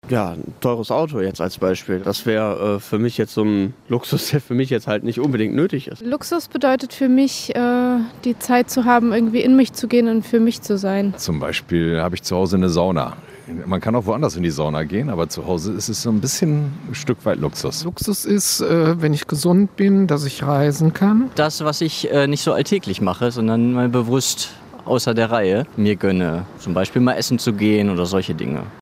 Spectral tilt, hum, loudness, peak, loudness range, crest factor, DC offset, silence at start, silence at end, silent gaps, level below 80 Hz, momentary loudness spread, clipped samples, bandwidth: -5.5 dB/octave; none; -19 LUFS; -2 dBFS; 4 LU; 18 dB; under 0.1%; 0.05 s; 0 s; none; -52 dBFS; 7 LU; under 0.1%; 16 kHz